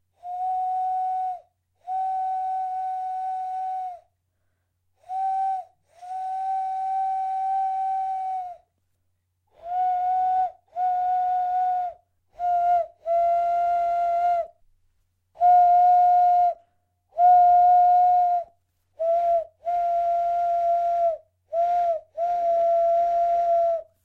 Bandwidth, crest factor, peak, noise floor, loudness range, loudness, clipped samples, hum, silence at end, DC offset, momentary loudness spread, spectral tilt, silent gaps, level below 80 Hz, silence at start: 4.4 kHz; 14 dB; -10 dBFS; -73 dBFS; 11 LU; -23 LUFS; under 0.1%; none; 0.2 s; under 0.1%; 14 LU; -4 dB/octave; none; -64 dBFS; 0.25 s